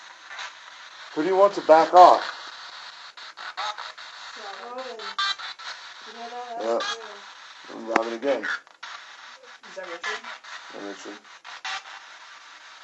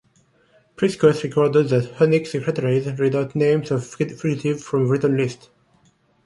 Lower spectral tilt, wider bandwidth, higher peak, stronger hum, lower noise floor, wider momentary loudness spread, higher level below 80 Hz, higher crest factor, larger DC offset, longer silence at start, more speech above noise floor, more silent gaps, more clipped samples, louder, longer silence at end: second, -2.5 dB/octave vs -7 dB/octave; second, 8.4 kHz vs 11.5 kHz; about the same, 0 dBFS vs -2 dBFS; neither; second, -46 dBFS vs -60 dBFS; first, 24 LU vs 7 LU; second, -78 dBFS vs -60 dBFS; first, 26 dB vs 18 dB; neither; second, 0 s vs 0.8 s; second, 26 dB vs 40 dB; neither; neither; about the same, -22 LUFS vs -20 LUFS; second, 0.05 s vs 0.9 s